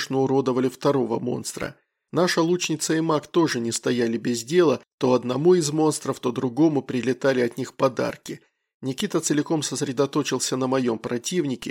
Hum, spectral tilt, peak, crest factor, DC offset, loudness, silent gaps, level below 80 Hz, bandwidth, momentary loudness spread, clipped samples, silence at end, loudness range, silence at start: none; -5 dB/octave; -8 dBFS; 16 dB; under 0.1%; -23 LUFS; 4.93-4.98 s, 8.74-8.80 s; -66 dBFS; 16.5 kHz; 8 LU; under 0.1%; 0 s; 3 LU; 0 s